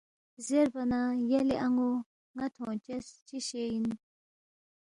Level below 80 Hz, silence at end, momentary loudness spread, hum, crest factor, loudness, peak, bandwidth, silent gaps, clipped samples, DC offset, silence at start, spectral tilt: -66 dBFS; 0.9 s; 13 LU; none; 16 dB; -32 LUFS; -16 dBFS; 11.5 kHz; 2.06-2.34 s, 3.22-3.26 s; under 0.1%; under 0.1%; 0.4 s; -5 dB/octave